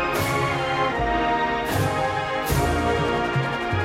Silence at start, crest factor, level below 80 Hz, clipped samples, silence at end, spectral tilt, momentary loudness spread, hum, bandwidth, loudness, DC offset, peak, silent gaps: 0 s; 14 dB; -36 dBFS; under 0.1%; 0 s; -5 dB/octave; 2 LU; none; 16 kHz; -23 LUFS; under 0.1%; -10 dBFS; none